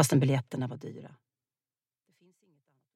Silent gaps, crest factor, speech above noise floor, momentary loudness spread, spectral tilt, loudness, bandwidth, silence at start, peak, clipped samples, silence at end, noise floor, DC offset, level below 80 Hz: none; 22 dB; over 61 dB; 20 LU; -5.5 dB/octave; -30 LUFS; 16 kHz; 0 s; -10 dBFS; under 0.1%; 1.9 s; under -90 dBFS; under 0.1%; -74 dBFS